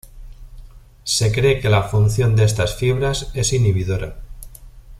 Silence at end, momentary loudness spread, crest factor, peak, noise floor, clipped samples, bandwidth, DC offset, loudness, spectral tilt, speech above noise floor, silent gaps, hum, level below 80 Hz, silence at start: 0 s; 13 LU; 16 dB; -2 dBFS; -40 dBFS; under 0.1%; 14.5 kHz; under 0.1%; -18 LUFS; -5 dB/octave; 23 dB; none; none; -34 dBFS; 0.15 s